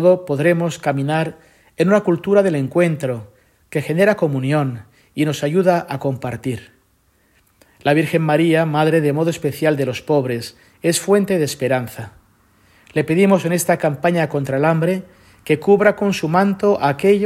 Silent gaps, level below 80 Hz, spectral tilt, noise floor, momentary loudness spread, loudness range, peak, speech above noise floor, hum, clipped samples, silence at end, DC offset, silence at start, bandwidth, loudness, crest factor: none; -58 dBFS; -6 dB/octave; -59 dBFS; 10 LU; 3 LU; 0 dBFS; 42 dB; none; under 0.1%; 0 s; under 0.1%; 0 s; 16 kHz; -18 LUFS; 18 dB